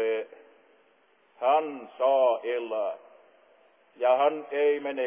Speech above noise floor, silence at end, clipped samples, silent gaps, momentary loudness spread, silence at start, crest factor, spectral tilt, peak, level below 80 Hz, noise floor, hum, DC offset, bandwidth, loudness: 38 dB; 0 s; under 0.1%; none; 11 LU; 0 s; 16 dB; -6.5 dB/octave; -12 dBFS; under -90 dBFS; -64 dBFS; none; under 0.1%; 3.6 kHz; -27 LUFS